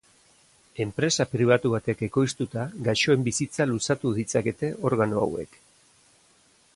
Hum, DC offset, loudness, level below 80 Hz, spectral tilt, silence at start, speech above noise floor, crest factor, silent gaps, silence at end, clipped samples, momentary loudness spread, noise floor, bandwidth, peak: none; under 0.1%; -25 LUFS; -58 dBFS; -5 dB/octave; 0.75 s; 36 dB; 18 dB; none; 1.3 s; under 0.1%; 9 LU; -61 dBFS; 11.5 kHz; -8 dBFS